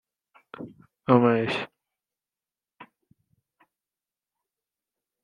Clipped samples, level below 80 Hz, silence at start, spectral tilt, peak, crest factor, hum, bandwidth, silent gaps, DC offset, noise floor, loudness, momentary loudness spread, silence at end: under 0.1%; -70 dBFS; 0.6 s; -8 dB/octave; -2 dBFS; 28 dB; none; 9.2 kHz; none; under 0.1%; under -90 dBFS; -23 LUFS; 24 LU; 2.4 s